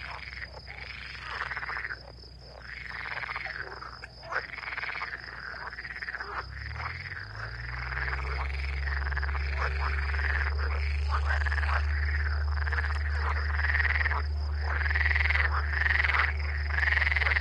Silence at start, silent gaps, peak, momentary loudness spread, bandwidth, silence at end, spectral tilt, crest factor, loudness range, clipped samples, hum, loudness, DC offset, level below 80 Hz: 0 s; none; -12 dBFS; 14 LU; 7 kHz; 0 s; -5.5 dB/octave; 20 dB; 10 LU; under 0.1%; none; -30 LUFS; under 0.1%; -34 dBFS